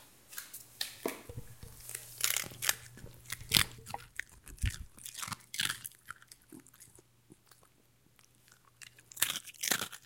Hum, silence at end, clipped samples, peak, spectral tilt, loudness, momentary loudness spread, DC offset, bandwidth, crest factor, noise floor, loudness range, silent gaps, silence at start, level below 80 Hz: none; 0 s; under 0.1%; -4 dBFS; -1 dB/octave; -35 LUFS; 22 LU; under 0.1%; 17 kHz; 38 dB; -68 dBFS; 9 LU; none; 0 s; -54 dBFS